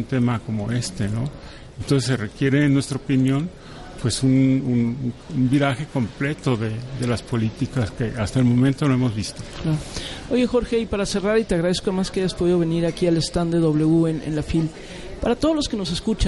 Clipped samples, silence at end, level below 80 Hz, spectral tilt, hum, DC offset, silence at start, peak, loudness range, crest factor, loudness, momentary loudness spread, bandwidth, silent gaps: under 0.1%; 0 s; -38 dBFS; -6.5 dB/octave; none; under 0.1%; 0 s; -6 dBFS; 2 LU; 14 dB; -22 LUFS; 10 LU; 11.5 kHz; none